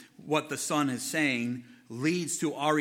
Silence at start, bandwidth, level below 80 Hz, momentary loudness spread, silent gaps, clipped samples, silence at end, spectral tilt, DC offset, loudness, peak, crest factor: 0 s; 17 kHz; -78 dBFS; 7 LU; none; under 0.1%; 0 s; -4 dB/octave; under 0.1%; -30 LUFS; -12 dBFS; 18 dB